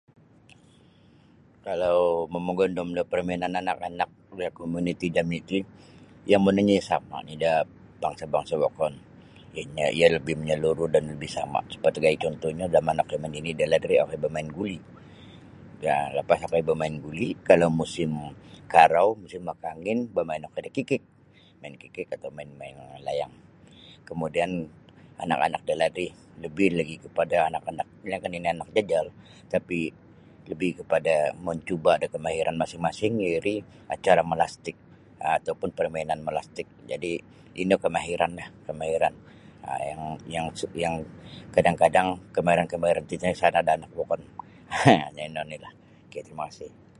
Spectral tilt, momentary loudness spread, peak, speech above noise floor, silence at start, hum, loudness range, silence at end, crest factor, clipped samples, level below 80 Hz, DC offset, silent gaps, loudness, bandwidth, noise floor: -5.5 dB/octave; 17 LU; 0 dBFS; 30 dB; 1.65 s; none; 6 LU; 0.3 s; 26 dB; under 0.1%; -56 dBFS; under 0.1%; none; -26 LUFS; 11.5 kHz; -56 dBFS